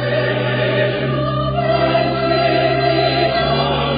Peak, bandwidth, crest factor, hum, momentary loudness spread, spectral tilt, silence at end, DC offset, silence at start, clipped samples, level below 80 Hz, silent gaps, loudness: -4 dBFS; 5.2 kHz; 12 dB; none; 3 LU; -4 dB/octave; 0 s; under 0.1%; 0 s; under 0.1%; -36 dBFS; none; -16 LUFS